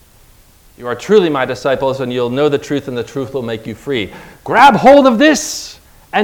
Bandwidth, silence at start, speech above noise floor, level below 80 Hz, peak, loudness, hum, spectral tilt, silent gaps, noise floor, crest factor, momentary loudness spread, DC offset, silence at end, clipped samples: 19 kHz; 0.8 s; 33 dB; -46 dBFS; 0 dBFS; -13 LUFS; none; -4.5 dB/octave; none; -45 dBFS; 14 dB; 17 LU; under 0.1%; 0 s; 1%